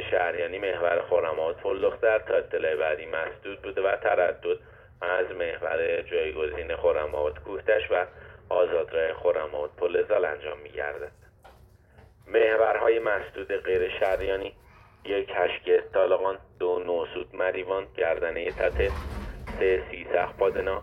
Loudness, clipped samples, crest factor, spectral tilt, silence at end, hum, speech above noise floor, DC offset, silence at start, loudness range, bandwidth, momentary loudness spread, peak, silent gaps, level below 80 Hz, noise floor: -27 LUFS; under 0.1%; 18 dB; -6.5 dB/octave; 0 s; none; 28 dB; under 0.1%; 0 s; 2 LU; 5.8 kHz; 10 LU; -10 dBFS; none; -46 dBFS; -55 dBFS